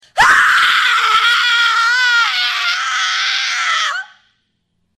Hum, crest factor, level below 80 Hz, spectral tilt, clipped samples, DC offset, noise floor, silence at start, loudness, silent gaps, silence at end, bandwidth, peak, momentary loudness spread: none; 14 dB; -52 dBFS; 2 dB/octave; under 0.1%; under 0.1%; -66 dBFS; 0.15 s; -12 LUFS; none; 0.9 s; 15.5 kHz; 0 dBFS; 6 LU